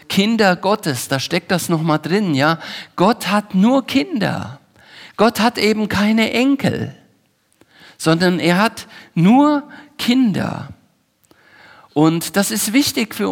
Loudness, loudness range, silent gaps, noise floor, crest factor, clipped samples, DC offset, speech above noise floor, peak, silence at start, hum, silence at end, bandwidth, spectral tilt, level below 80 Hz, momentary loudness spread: -17 LUFS; 2 LU; none; -60 dBFS; 16 dB; under 0.1%; under 0.1%; 44 dB; 0 dBFS; 0.1 s; none; 0 s; 17.5 kHz; -5 dB/octave; -56 dBFS; 11 LU